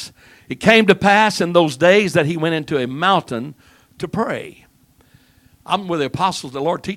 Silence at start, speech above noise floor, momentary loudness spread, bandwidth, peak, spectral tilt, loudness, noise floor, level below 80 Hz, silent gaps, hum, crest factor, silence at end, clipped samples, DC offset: 0 s; 37 dB; 16 LU; 16 kHz; 0 dBFS; -5 dB/octave; -17 LUFS; -54 dBFS; -54 dBFS; none; none; 18 dB; 0 s; under 0.1%; under 0.1%